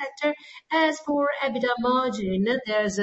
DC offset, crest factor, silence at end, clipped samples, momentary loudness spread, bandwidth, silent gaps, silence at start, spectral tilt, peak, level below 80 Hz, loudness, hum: under 0.1%; 14 dB; 0 s; under 0.1%; 5 LU; 8.2 kHz; none; 0 s; -5 dB/octave; -10 dBFS; -58 dBFS; -25 LUFS; none